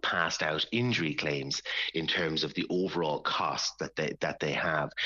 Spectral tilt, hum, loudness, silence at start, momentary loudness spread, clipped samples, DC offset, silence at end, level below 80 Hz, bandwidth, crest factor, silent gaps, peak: -2.5 dB/octave; none; -30 LUFS; 0.05 s; 4 LU; under 0.1%; under 0.1%; 0 s; -64 dBFS; 7.6 kHz; 18 dB; none; -14 dBFS